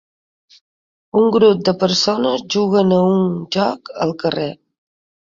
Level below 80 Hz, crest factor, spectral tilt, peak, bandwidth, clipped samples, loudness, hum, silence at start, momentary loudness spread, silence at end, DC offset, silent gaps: -58 dBFS; 16 dB; -5.5 dB/octave; -2 dBFS; 7.6 kHz; under 0.1%; -16 LUFS; none; 1.15 s; 9 LU; 0.85 s; under 0.1%; none